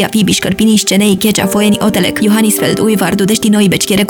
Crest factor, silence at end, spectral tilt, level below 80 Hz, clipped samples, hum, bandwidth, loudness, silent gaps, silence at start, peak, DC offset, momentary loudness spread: 10 dB; 0 s; -4 dB/octave; -42 dBFS; under 0.1%; none; 20 kHz; -10 LUFS; none; 0 s; 0 dBFS; under 0.1%; 2 LU